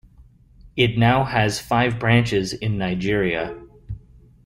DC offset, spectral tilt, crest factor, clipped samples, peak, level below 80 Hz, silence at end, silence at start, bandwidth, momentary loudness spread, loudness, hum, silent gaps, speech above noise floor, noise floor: under 0.1%; -6 dB/octave; 18 dB; under 0.1%; -4 dBFS; -44 dBFS; 0.5 s; 0.2 s; 15.5 kHz; 20 LU; -20 LUFS; none; none; 30 dB; -50 dBFS